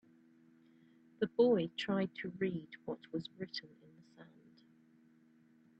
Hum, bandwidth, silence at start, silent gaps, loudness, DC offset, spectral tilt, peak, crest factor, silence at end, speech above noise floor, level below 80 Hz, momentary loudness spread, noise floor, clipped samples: none; 8 kHz; 1.2 s; none; -37 LUFS; under 0.1%; -7 dB/octave; -18 dBFS; 22 dB; 1.55 s; 30 dB; -80 dBFS; 15 LU; -67 dBFS; under 0.1%